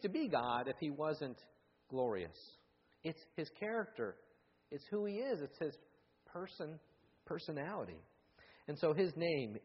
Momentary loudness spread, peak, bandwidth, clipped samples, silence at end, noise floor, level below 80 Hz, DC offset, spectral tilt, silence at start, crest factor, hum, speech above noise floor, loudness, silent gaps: 16 LU; -22 dBFS; 5.8 kHz; under 0.1%; 0.05 s; -67 dBFS; -78 dBFS; under 0.1%; -5 dB/octave; 0 s; 20 dB; none; 26 dB; -42 LUFS; none